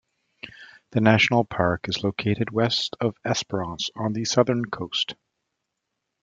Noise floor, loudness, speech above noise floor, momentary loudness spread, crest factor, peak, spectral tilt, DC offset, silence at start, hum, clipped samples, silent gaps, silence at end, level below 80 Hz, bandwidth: -81 dBFS; -24 LUFS; 57 dB; 10 LU; 22 dB; -4 dBFS; -5 dB/octave; under 0.1%; 0.45 s; none; under 0.1%; none; 1.1 s; -58 dBFS; 7.8 kHz